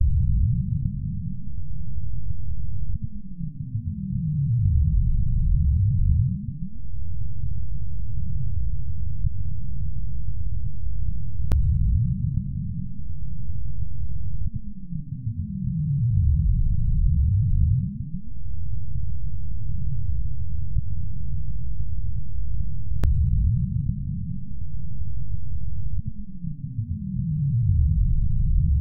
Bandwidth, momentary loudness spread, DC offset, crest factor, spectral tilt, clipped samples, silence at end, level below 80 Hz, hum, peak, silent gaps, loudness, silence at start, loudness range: 2 kHz; 12 LU; 5%; 14 dB; -11.5 dB/octave; under 0.1%; 0 s; -26 dBFS; none; -8 dBFS; none; -27 LUFS; 0 s; 8 LU